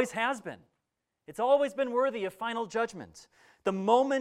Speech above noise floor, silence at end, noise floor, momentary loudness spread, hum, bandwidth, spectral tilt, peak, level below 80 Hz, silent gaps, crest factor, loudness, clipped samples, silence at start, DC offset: 54 dB; 0 s; -84 dBFS; 19 LU; none; 14 kHz; -4.5 dB/octave; -10 dBFS; -74 dBFS; none; 20 dB; -30 LUFS; under 0.1%; 0 s; under 0.1%